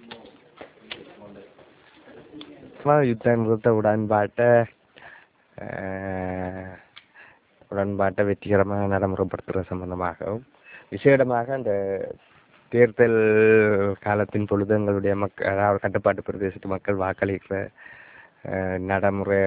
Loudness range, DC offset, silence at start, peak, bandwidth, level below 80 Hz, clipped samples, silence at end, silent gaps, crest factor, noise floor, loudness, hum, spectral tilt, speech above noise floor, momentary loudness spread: 7 LU; under 0.1%; 0.1 s; -4 dBFS; 4 kHz; -50 dBFS; under 0.1%; 0 s; none; 20 dB; -54 dBFS; -23 LUFS; none; -11.5 dB/octave; 32 dB; 19 LU